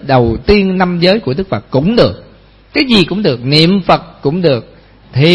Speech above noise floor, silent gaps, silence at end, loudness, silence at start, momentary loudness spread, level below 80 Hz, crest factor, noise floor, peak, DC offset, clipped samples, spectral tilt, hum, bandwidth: 30 dB; none; 0 s; -12 LUFS; 0 s; 8 LU; -32 dBFS; 12 dB; -41 dBFS; 0 dBFS; under 0.1%; 0.4%; -7 dB/octave; none; 11 kHz